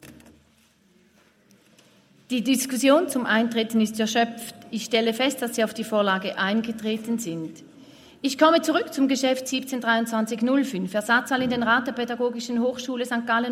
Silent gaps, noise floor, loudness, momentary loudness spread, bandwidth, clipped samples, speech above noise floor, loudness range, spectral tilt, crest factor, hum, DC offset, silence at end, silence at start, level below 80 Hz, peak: none; -60 dBFS; -24 LUFS; 9 LU; 16 kHz; under 0.1%; 37 dB; 2 LU; -3.5 dB/octave; 20 dB; none; under 0.1%; 0 s; 0.05 s; -68 dBFS; -6 dBFS